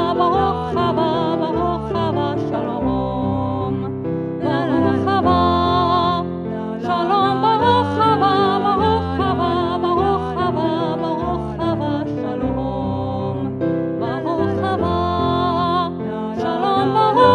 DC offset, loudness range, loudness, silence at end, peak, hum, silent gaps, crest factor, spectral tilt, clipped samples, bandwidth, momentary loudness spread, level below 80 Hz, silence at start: under 0.1%; 5 LU; -19 LUFS; 0 s; 0 dBFS; none; none; 18 dB; -8 dB/octave; under 0.1%; 10.5 kHz; 7 LU; -40 dBFS; 0 s